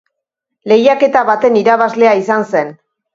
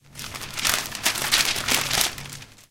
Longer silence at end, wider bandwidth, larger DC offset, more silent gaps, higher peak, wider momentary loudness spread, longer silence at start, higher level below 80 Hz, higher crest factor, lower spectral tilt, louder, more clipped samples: first, 0.4 s vs 0.1 s; second, 7.6 kHz vs 17 kHz; neither; neither; about the same, 0 dBFS vs 0 dBFS; second, 7 LU vs 16 LU; first, 0.65 s vs 0.1 s; second, -60 dBFS vs -48 dBFS; second, 12 dB vs 26 dB; first, -5.5 dB/octave vs -0.5 dB/octave; first, -11 LUFS vs -22 LUFS; neither